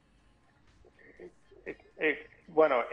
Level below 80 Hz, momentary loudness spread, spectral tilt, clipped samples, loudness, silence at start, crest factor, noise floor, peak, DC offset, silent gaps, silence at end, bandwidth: -68 dBFS; 26 LU; -6.5 dB/octave; under 0.1%; -30 LUFS; 1.2 s; 22 dB; -65 dBFS; -12 dBFS; under 0.1%; none; 0 s; 5.6 kHz